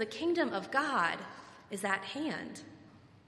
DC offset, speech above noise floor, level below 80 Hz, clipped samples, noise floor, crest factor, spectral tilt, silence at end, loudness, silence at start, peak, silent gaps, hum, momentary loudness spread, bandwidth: under 0.1%; 23 dB; -74 dBFS; under 0.1%; -58 dBFS; 20 dB; -4 dB/octave; 0.2 s; -34 LUFS; 0 s; -14 dBFS; none; none; 17 LU; 13.5 kHz